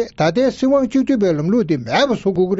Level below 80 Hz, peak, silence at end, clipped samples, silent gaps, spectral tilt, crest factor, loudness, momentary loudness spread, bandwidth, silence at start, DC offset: -48 dBFS; -4 dBFS; 0 s; under 0.1%; none; -5.5 dB/octave; 12 dB; -17 LUFS; 2 LU; 7.8 kHz; 0 s; under 0.1%